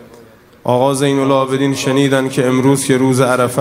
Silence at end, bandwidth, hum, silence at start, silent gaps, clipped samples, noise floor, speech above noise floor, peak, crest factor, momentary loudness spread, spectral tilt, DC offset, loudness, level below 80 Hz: 0 s; 16 kHz; none; 0 s; none; under 0.1%; -42 dBFS; 29 dB; 0 dBFS; 14 dB; 3 LU; -5.5 dB/octave; under 0.1%; -14 LUFS; -56 dBFS